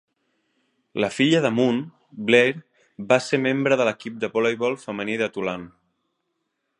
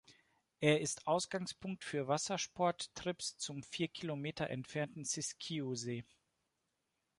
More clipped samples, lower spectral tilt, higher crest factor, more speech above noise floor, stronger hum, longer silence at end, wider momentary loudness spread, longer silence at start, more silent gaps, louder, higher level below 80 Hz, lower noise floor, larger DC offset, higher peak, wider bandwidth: neither; about the same, -5 dB/octave vs -4 dB/octave; about the same, 22 dB vs 26 dB; first, 54 dB vs 47 dB; neither; about the same, 1.1 s vs 1.15 s; first, 13 LU vs 8 LU; first, 0.95 s vs 0.1 s; neither; first, -22 LUFS vs -39 LUFS; first, -68 dBFS vs -74 dBFS; second, -76 dBFS vs -86 dBFS; neither; first, -2 dBFS vs -16 dBFS; about the same, 11 kHz vs 11.5 kHz